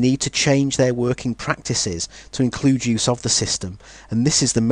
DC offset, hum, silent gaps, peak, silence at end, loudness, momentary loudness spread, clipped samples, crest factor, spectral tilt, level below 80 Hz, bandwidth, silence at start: under 0.1%; none; none; -2 dBFS; 0 s; -20 LUFS; 8 LU; under 0.1%; 18 dB; -4 dB/octave; -46 dBFS; 10.5 kHz; 0 s